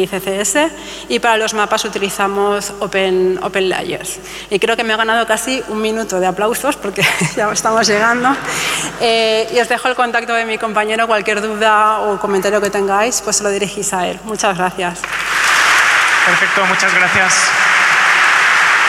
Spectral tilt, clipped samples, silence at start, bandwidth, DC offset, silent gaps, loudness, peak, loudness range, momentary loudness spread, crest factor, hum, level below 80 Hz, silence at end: -2 dB/octave; under 0.1%; 0 s; 16.5 kHz; under 0.1%; none; -13 LUFS; -2 dBFS; 6 LU; 9 LU; 12 dB; none; -48 dBFS; 0 s